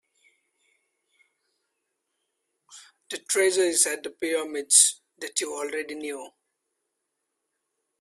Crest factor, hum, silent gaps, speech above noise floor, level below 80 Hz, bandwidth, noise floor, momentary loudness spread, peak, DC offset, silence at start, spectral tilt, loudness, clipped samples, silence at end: 26 dB; none; none; 56 dB; -78 dBFS; 15.5 kHz; -81 dBFS; 20 LU; -4 dBFS; under 0.1%; 2.7 s; 0.5 dB/octave; -23 LUFS; under 0.1%; 1.75 s